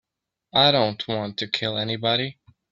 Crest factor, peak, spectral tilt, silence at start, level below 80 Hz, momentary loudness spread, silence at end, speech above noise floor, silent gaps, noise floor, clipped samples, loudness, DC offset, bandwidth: 20 dB; -4 dBFS; -5.5 dB/octave; 0.55 s; -62 dBFS; 10 LU; 0.4 s; 52 dB; none; -75 dBFS; under 0.1%; -22 LUFS; under 0.1%; 7.6 kHz